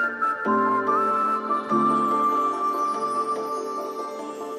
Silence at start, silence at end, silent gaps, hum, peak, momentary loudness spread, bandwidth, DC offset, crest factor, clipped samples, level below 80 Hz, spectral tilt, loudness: 0 s; 0 s; none; none; -10 dBFS; 9 LU; 14.5 kHz; under 0.1%; 14 dB; under 0.1%; -84 dBFS; -5.5 dB/octave; -24 LUFS